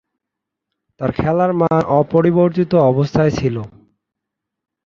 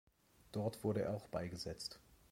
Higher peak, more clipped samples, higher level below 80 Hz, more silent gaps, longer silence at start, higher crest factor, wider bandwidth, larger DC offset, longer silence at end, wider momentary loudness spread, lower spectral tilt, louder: first, -2 dBFS vs -26 dBFS; neither; first, -44 dBFS vs -66 dBFS; neither; first, 1 s vs 0.55 s; about the same, 16 dB vs 18 dB; second, 7 kHz vs 16.5 kHz; neither; first, 1.15 s vs 0.15 s; about the same, 9 LU vs 9 LU; first, -8.5 dB/octave vs -6 dB/octave; first, -16 LUFS vs -43 LUFS